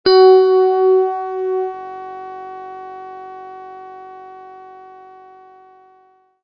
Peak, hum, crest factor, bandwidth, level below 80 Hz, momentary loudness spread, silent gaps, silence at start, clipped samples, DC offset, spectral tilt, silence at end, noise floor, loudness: 0 dBFS; none; 18 dB; 5.6 kHz; -64 dBFS; 27 LU; none; 0.05 s; under 0.1%; under 0.1%; -6 dB/octave; 2.05 s; -54 dBFS; -14 LUFS